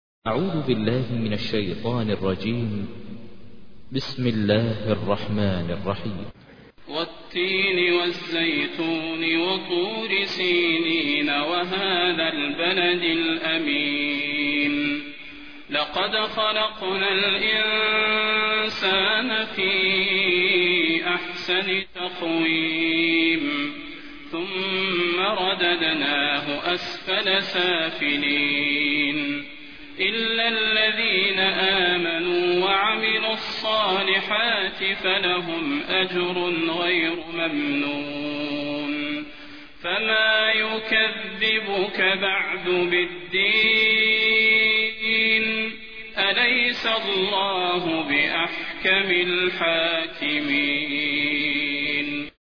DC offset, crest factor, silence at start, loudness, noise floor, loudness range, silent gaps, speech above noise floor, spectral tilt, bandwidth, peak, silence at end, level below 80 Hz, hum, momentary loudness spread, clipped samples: 0.5%; 18 dB; 0.2 s; -21 LUFS; -48 dBFS; 7 LU; none; 25 dB; -5.5 dB/octave; 5.4 kHz; -6 dBFS; 0.05 s; -56 dBFS; none; 9 LU; under 0.1%